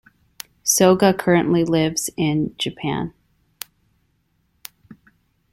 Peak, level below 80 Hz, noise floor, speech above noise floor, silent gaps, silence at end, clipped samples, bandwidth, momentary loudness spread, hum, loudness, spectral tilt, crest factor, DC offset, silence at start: 0 dBFS; -54 dBFS; -66 dBFS; 48 dB; none; 0.6 s; under 0.1%; 16.5 kHz; 24 LU; none; -19 LUFS; -4.5 dB/octave; 22 dB; under 0.1%; 0.65 s